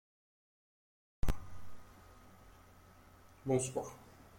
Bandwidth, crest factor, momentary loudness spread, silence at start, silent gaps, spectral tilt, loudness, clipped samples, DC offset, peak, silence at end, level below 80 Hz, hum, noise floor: 16.5 kHz; 18 dB; 26 LU; 1.25 s; none; -5.5 dB/octave; -40 LUFS; under 0.1%; under 0.1%; -22 dBFS; 0 s; -48 dBFS; none; -61 dBFS